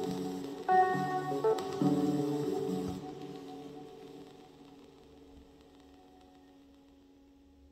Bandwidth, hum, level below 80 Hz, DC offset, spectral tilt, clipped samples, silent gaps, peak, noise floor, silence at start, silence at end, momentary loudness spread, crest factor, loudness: 16 kHz; none; -68 dBFS; under 0.1%; -6.5 dB/octave; under 0.1%; none; -16 dBFS; -60 dBFS; 0 s; 1.35 s; 24 LU; 20 dB; -33 LUFS